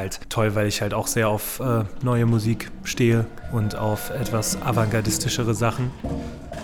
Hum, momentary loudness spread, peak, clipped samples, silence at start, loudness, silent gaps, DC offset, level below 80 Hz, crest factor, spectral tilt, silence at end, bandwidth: none; 8 LU; -6 dBFS; under 0.1%; 0 s; -23 LUFS; none; under 0.1%; -42 dBFS; 16 dB; -5 dB/octave; 0 s; 19 kHz